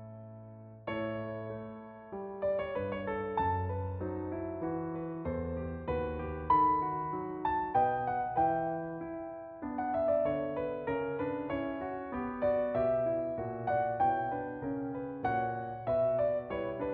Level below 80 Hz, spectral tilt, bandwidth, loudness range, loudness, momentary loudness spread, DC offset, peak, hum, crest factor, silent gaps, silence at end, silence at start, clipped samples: -54 dBFS; -6.5 dB/octave; 4.8 kHz; 5 LU; -34 LUFS; 11 LU; under 0.1%; -16 dBFS; none; 18 dB; none; 0 s; 0 s; under 0.1%